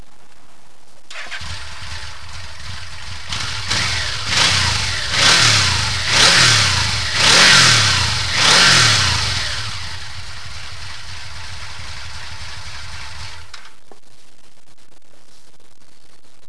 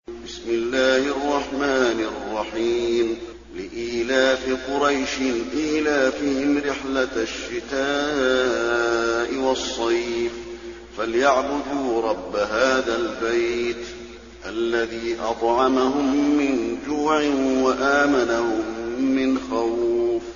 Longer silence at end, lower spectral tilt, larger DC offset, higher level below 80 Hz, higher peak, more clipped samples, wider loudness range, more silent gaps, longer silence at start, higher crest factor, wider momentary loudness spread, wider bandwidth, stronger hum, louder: first, 2.8 s vs 0 s; about the same, -1 dB/octave vs -2 dB/octave; first, 5% vs 0.1%; first, -38 dBFS vs -48 dBFS; first, 0 dBFS vs -4 dBFS; neither; first, 21 LU vs 3 LU; neither; first, 1.1 s vs 0.1 s; about the same, 18 dB vs 18 dB; first, 23 LU vs 9 LU; first, 11 kHz vs 7.4 kHz; neither; first, -12 LUFS vs -22 LUFS